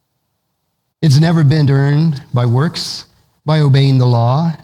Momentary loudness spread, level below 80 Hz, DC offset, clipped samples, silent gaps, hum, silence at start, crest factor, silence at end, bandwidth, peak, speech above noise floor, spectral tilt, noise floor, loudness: 9 LU; -48 dBFS; under 0.1%; under 0.1%; none; none; 1 s; 14 dB; 0.05 s; 11 kHz; 0 dBFS; 57 dB; -7 dB/octave; -69 dBFS; -13 LUFS